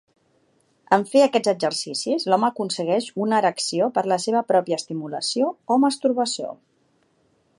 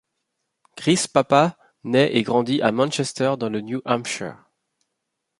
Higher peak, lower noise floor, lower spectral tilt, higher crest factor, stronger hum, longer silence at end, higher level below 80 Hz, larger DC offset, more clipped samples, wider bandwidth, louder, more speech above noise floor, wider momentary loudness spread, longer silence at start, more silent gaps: about the same, -2 dBFS vs 0 dBFS; second, -64 dBFS vs -79 dBFS; about the same, -4 dB/octave vs -4.5 dB/octave; about the same, 20 dB vs 22 dB; neither; about the same, 1.05 s vs 1.05 s; second, -76 dBFS vs -64 dBFS; neither; neither; about the same, 11.5 kHz vs 11.5 kHz; about the same, -22 LUFS vs -21 LUFS; second, 43 dB vs 58 dB; second, 7 LU vs 10 LU; first, 0.9 s vs 0.75 s; neither